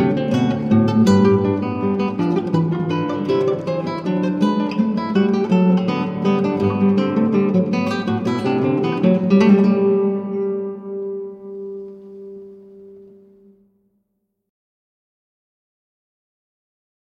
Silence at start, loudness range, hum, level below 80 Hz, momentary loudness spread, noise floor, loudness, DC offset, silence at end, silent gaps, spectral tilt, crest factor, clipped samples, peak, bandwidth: 0 s; 13 LU; none; -58 dBFS; 15 LU; -72 dBFS; -18 LUFS; under 0.1%; 4.15 s; none; -8 dB/octave; 16 dB; under 0.1%; -2 dBFS; 7.6 kHz